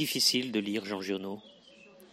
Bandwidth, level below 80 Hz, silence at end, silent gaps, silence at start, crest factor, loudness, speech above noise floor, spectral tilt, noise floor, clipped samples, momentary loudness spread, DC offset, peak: 16 kHz; -78 dBFS; 0.05 s; none; 0 s; 20 dB; -30 LUFS; 24 dB; -2.5 dB/octave; -56 dBFS; under 0.1%; 15 LU; under 0.1%; -12 dBFS